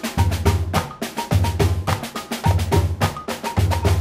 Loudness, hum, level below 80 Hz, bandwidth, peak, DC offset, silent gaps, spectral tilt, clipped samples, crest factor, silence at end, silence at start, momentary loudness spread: -21 LUFS; none; -28 dBFS; 16 kHz; -4 dBFS; under 0.1%; none; -5.5 dB/octave; under 0.1%; 16 dB; 0 s; 0 s; 7 LU